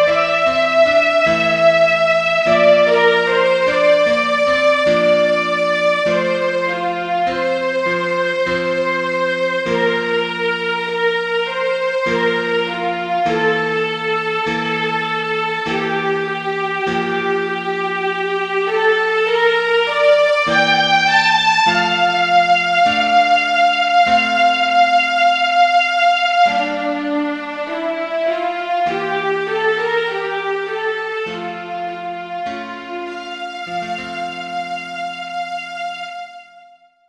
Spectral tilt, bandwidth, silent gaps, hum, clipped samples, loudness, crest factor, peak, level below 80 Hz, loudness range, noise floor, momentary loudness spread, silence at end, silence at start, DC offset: -4 dB/octave; 10.5 kHz; none; none; under 0.1%; -16 LUFS; 14 dB; -2 dBFS; -56 dBFS; 11 LU; -47 dBFS; 12 LU; 0.5 s; 0 s; under 0.1%